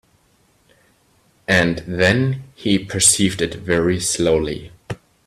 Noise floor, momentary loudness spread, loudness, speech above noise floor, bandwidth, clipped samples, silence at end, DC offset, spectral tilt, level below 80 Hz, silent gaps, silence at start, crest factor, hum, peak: -59 dBFS; 18 LU; -17 LUFS; 40 dB; 15 kHz; under 0.1%; 0.3 s; under 0.1%; -3.5 dB/octave; -46 dBFS; none; 1.5 s; 20 dB; none; 0 dBFS